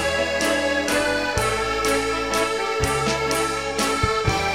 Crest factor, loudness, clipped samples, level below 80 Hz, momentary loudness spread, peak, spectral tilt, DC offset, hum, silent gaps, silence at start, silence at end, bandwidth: 16 dB; -21 LUFS; under 0.1%; -38 dBFS; 2 LU; -6 dBFS; -3.5 dB/octave; 0.3%; none; none; 0 s; 0 s; 16 kHz